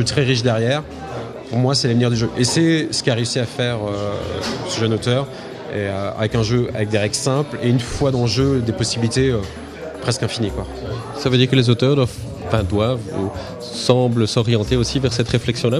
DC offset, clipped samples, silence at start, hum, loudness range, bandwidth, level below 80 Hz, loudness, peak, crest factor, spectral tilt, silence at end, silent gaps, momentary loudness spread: under 0.1%; under 0.1%; 0 s; none; 3 LU; 13 kHz; -40 dBFS; -19 LUFS; 0 dBFS; 18 dB; -5.5 dB/octave; 0 s; none; 12 LU